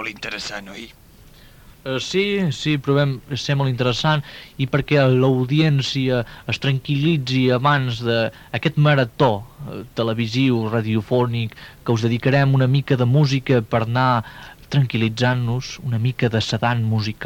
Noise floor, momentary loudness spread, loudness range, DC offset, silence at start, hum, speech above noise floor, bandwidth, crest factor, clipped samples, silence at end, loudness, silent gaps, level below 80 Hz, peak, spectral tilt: -46 dBFS; 11 LU; 3 LU; under 0.1%; 0 s; none; 27 dB; 15.5 kHz; 16 dB; under 0.1%; 0 s; -20 LUFS; none; -48 dBFS; -4 dBFS; -6.5 dB/octave